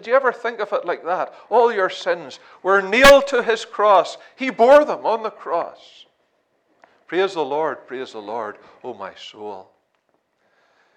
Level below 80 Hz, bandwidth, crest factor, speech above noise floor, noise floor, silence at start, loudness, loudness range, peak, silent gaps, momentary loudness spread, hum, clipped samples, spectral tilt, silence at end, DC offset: -48 dBFS; 16 kHz; 18 dB; 49 dB; -67 dBFS; 0.05 s; -18 LUFS; 12 LU; -2 dBFS; none; 21 LU; none; under 0.1%; -3 dB/octave; 1.35 s; under 0.1%